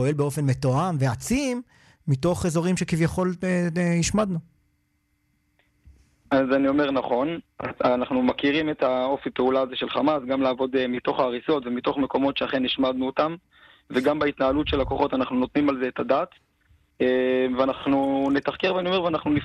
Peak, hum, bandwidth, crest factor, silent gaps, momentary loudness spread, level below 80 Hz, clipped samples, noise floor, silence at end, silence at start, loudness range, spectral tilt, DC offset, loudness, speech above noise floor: -8 dBFS; none; 13 kHz; 16 dB; none; 4 LU; -48 dBFS; under 0.1%; -70 dBFS; 0 s; 0 s; 3 LU; -6 dB/octave; under 0.1%; -24 LUFS; 47 dB